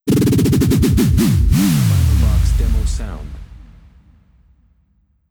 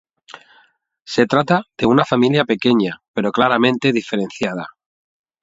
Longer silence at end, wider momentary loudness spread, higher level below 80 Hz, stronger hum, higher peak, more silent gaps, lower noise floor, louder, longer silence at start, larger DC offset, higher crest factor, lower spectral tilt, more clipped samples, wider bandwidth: first, 1.75 s vs 0.75 s; first, 14 LU vs 9 LU; first, -20 dBFS vs -56 dBFS; neither; second, -4 dBFS vs 0 dBFS; second, none vs 3.08-3.14 s; about the same, -59 dBFS vs -57 dBFS; about the same, -15 LUFS vs -17 LUFS; second, 0.05 s vs 0.3 s; neither; second, 12 dB vs 18 dB; about the same, -6.5 dB/octave vs -6 dB/octave; neither; first, over 20 kHz vs 7.8 kHz